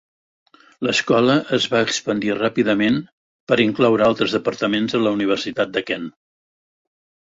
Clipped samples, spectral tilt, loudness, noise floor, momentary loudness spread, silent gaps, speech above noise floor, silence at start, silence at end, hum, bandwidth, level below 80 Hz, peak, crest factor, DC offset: under 0.1%; -4.5 dB/octave; -19 LUFS; under -90 dBFS; 7 LU; 3.12-3.47 s; over 71 dB; 0.8 s; 1.2 s; none; 8 kHz; -58 dBFS; -2 dBFS; 18 dB; under 0.1%